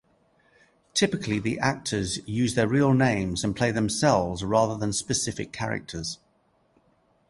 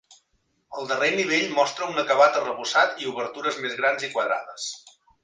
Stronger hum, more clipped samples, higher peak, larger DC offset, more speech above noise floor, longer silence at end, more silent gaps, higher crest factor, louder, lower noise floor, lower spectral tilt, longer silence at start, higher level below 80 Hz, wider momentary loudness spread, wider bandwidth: neither; neither; about the same, -6 dBFS vs -4 dBFS; neither; second, 41 dB vs 47 dB; first, 1.15 s vs 0.35 s; neither; about the same, 20 dB vs 20 dB; about the same, -25 LUFS vs -23 LUFS; second, -66 dBFS vs -71 dBFS; first, -4.5 dB/octave vs -2.5 dB/octave; first, 0.95 s vs 0.1 s; first, -50 dBFS vs -74 dBFS; second, 9 LU vs 14 LU; first, 11.5 kHz vs 9.8 kHz